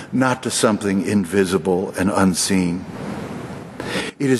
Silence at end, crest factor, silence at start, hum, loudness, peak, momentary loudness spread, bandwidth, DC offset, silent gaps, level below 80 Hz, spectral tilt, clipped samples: 0 s; 16 dB; 0 s; none; -20 LUFS; -4 dBFS; 13 LU; 12.5 kHz; under 0.1%; none; -52 dBFS; -5 dB/octave; under 0.1%